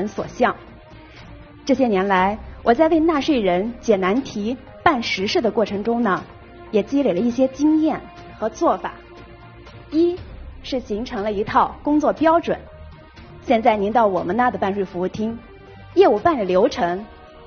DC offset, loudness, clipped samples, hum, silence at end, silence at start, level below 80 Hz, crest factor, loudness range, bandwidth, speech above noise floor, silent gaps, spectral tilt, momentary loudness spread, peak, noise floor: under 0.1%; -20 LUFS; under 0.1%; none; 0 s; 0 s; -44 dBFS; 18 dB; 4 LU; 6.8 kHz; 23 dB; none; -4.5 dB/octave; 11 LU; -2 dBFS; -42 dBFS